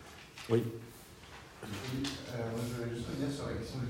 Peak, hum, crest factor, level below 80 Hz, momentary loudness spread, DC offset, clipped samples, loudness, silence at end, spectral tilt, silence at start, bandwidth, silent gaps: -16 dBFS; none; 22 dB; -58 dBFS; 18 LU; under 0.1%; under 0.1%; -38 LUFS; 0 s; -6 dB/octave; 0 s; 16 kHz; none